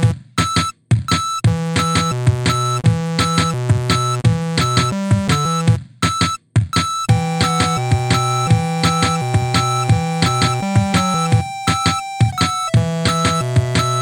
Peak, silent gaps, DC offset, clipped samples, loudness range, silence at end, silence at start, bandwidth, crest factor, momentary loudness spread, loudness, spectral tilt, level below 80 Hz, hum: 0 dBFS; none; under 0.1%; under 0.1%; 1 LU; 0 s; 0 s; 18 kHz; 16 dB; 3 LU; -17 LUFS; -5 dB/octave; -38 dBFS; none